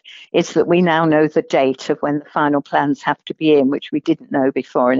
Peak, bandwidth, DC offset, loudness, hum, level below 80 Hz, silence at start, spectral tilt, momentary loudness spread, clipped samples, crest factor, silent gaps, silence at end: -4 dBFS; 7.8 kHz; under 0.1%; -17 LUFS; none; -64 dBFS; 0.05 s; -5 dB/octave; 6 LU; under 0.1%; 14 dB; none; 0 s